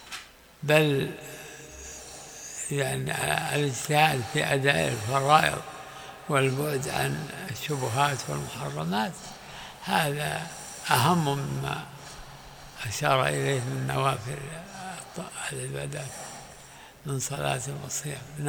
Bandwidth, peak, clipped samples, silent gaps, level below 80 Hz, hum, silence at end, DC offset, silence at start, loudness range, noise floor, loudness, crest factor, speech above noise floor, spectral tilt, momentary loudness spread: over 20 kHz; -4 dBFS; under 0.1%; none; -56 dBFS; none; 0 s; under 0.1%; 0 s; 8 LU; -48 dBFS; -27 LUFS; 26 dB; 21 dB; -4 dB/octave; 19 LU